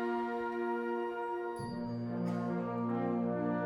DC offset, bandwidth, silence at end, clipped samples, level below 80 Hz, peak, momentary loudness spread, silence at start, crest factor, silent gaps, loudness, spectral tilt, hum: under 0.1%; 11 kHz; 0 s; under 0.1%; -68 dBFS; -22 dBFS; 5 LU; 0 s; 14 dB; none; -36 LUFS; -8.5 dB/octave; none